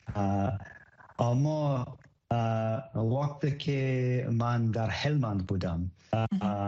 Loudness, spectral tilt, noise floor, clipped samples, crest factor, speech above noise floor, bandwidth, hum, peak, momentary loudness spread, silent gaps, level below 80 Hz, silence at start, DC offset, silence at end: -30 LUFS; -8 dB/octave; -54 dBFS; under 0.1%; 18 dB; 25 dB; 7.4 kHz; none; -12 dBFS; 6 LU; none; -54 dBFS; 0.05 s; under 0.1%; 0 s